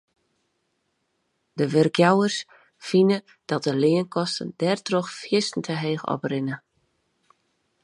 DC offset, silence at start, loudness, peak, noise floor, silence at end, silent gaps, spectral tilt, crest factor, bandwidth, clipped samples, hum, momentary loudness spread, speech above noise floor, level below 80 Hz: under 0.1%; 1.55 s; -23 LUFS; -4 dBFS; -74 dBFS; 1.25 s; none; -5.5 dB/octave; 22 dB; 11.5 kHz; under 0.1%; none; 12 LU; 51 dB; -72 dBFS